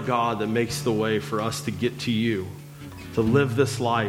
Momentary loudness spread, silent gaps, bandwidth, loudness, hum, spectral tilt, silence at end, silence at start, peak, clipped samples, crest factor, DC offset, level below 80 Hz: 12 LU; none; 16.5 kHz; -25 LUFS; none; -5.5 dB/octave; 0 s; 0 s; -6 dBFS; under 0.1%; 18 dB; under 0.1%; -54 dBFS